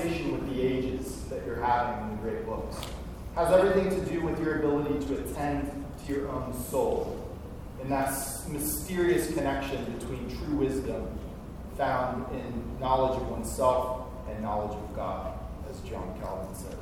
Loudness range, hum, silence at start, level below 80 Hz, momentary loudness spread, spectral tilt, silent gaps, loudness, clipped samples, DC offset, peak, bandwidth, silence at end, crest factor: 4 LU; none; 0 s; -42 dBFS; 12 LU; -5.5 dB/octave; none; -31 LUFS; under 0.1%; under 0.1%; -10 dBFS; 18.5 kHz; 0 s; 20 dB